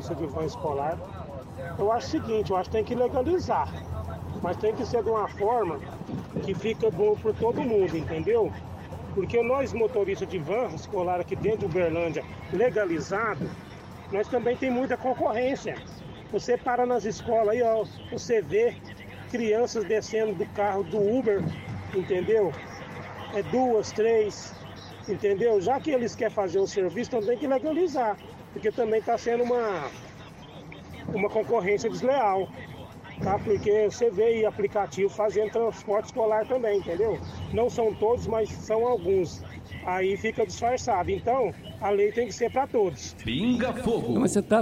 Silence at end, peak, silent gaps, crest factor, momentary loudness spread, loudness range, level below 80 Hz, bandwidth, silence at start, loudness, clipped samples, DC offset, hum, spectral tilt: 0 s; -10 dBFS; none; 16 dB; 13 LU; 2 LU; -52 dBFS; 14 kHz; 0 s; -27 LUFS; under 0.1%; under 0.1%; none; -6 dB/octave